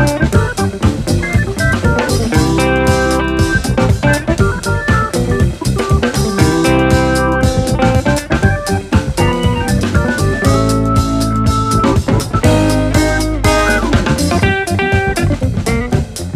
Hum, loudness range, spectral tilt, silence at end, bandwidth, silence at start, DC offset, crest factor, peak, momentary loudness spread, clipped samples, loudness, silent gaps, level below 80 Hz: none; 1 LU; -5.5 dB/octave; 0 s; 15.5 kHz; 0 s; under 0.1%; 12 dB; 0 dBFS; 3 LU; under 0.1%; -13 LUFS; none; -22 dBFS